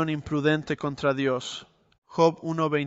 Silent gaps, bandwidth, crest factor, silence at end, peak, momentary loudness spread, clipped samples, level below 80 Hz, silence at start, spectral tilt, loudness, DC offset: 1.98-2.02 s; 8.2 kHz; 18 dB; 0 s; -8 dBFS; 12 LU; under 0.1%; -58 dBFS; 0 s; -6 dB/octave; -26 LUFS; under 0.1%